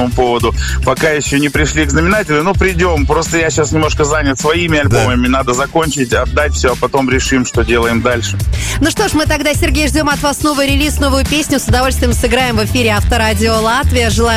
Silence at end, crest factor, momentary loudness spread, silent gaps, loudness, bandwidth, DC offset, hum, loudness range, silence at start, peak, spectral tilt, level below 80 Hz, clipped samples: 0 s; 12 dB; 2 LU; none; -12 LUFS; 16 kHz; under 0.1%; none; 1 LU; 0 s; 0 dBFS; -4.5 dB/octave; -20 dBFS; under 0.1%